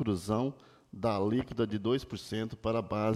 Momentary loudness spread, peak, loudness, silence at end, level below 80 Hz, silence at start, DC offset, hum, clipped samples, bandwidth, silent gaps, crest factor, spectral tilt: 6 LU; -18 dBFS; -33 LUFS; 0 s; -58 dBFS; 0 s; under 0.1%; none; under 0.1%; 14 kHz; none; 14 dB; -7 dB/octave